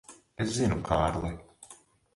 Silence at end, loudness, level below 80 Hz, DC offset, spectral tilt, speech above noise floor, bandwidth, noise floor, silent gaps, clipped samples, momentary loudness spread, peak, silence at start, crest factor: 0.4 s; -30 LUFS; -44 dBFS; under 0.1%; -5.5 dB/octave; 28 dB; 11.5 kHz; -56 dBFS; none; under 0.1%; 22 LU; -10 dBFS; 0.1 s; 22 dB